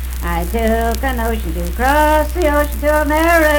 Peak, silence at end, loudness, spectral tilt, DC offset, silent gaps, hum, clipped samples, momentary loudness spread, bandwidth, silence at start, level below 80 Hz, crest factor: 0 dBFS; 0 s; -16 LUFS; -5.5 dB/octave; under 0.1%; none; none; under 0.1%; 8 LU; 19 kHz; 0 s; -20 dBFS; 14 dB